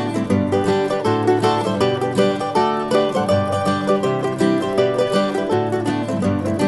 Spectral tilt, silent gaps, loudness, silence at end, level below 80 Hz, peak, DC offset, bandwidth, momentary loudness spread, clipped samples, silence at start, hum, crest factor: -6.5 dB/octave; none; -19 LUFS; 0 s; -52 dBFS; -4 dBFS; under 0.1%; 12 kHz; 3 LU; under 0.1%; 0 s; none; 14 dB